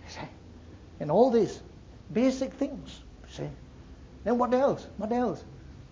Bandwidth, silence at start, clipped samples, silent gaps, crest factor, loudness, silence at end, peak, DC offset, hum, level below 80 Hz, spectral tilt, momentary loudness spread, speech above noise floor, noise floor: 7.6 kHz; 0.05 s; under 0.1%; none; 20 dB; -28 LUFS; 0.05 s; -10 dBFS; under 0.1%; none; -52 dBFS; -6.5 dB/octave; 26 LU; 21 dB; -48 dBFS